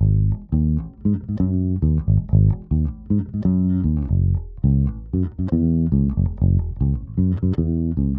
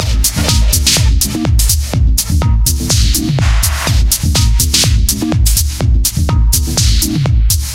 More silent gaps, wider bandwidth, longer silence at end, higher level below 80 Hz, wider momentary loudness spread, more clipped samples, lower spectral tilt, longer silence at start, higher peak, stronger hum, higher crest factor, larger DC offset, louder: neither; second, 2 kHz vs 17.5 kHz; about the same, 0 s vs 0 s; second, -26 dBFS vs -14 dBFS; about the same, 5 LU vs 3 LU; neither; first, -14 dB/octave vs -3.5 dB/octave; about the same, 0 s vs 0 s; second, -4 dBFS vs 0 dBFS; neither; first, 16 dB vs 10 dB; neither; second, -21 LUFS vs -12 LUFS